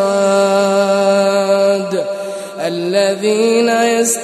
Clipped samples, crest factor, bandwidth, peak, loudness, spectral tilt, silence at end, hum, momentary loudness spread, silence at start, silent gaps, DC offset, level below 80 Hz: under 0.1%; 12 dB; 13.5 kHz; -2 dBFS; -14 LUFS; -4 dB/octave; 0 s; none; 9 LU; 0 s; none; under 0.1%; -70 dBFS